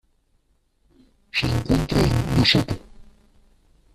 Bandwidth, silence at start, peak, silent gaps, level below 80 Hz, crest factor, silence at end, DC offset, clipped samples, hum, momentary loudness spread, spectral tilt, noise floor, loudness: 14 kHz; 1.35 s; -4 dBFS; none; -36 dBFS; 20 dB; 0.9 s; under 0.1%; under 0.1%; none; 11 LU; -5.5 dB/octave; -65 dBFS; -21 LUFS